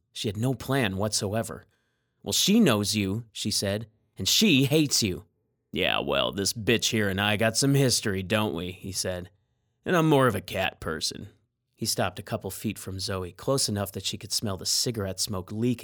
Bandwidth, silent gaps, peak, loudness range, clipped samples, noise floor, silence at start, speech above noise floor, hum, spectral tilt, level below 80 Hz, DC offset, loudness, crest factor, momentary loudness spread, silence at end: over 20 kHz; none; -6 dBFS; 6 LU; under 0.1%; -73 dBFS; 0.15 s; 47 dB; none; -4 dB/octave; -60 dBFS; under 0.1%; -26 LUFS; 20 dB; 12 LU; 0 s